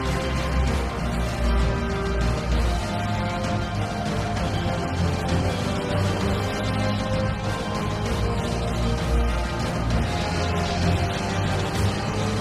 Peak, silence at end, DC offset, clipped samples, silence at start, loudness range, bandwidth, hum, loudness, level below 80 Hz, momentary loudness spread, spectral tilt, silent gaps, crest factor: -10 dBFS; 0 s; under 0.1%; under 0.1%; 0 s; 1 LU; 12.5 kHz; none; -25 LUFS; -30 dBFS; 3 LU; -6 dB/octave; none; 12 dB